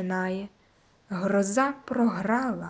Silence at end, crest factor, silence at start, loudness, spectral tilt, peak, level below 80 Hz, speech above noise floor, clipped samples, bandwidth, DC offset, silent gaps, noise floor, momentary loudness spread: 0 s; 16 dB; 0 s; -27 LUFS; -6 dB/octave; -12 dBFS; -64 dBFS; 35 dB; under 0.1%; 8 kHz; under 0.1%; none; -62 dBFS; 11 LU